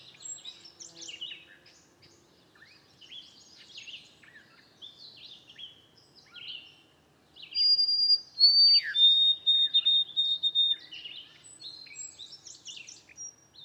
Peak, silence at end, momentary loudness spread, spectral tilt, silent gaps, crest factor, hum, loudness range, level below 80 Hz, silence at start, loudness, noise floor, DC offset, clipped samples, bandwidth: -12 dBFS; 0.35 s; 27 LU; 2 dB/octave; none; 18 dB; none; 24 LU; -82 dBFS; 0.25 s; -21 LUFS; -63 dBFS; under 0.1%; under 0.1%; 11.5 kHz